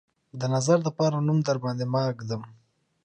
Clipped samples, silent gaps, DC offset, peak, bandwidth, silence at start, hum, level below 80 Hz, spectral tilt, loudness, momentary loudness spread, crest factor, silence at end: under 0.1%; none; under 0.1%; -8 dBFS; 9.6 kHz; 0.35 s; none; -68 dBFS; -6.5 dB/octave; -26 LUFS; 12 LU; 20 dB; 0.5 s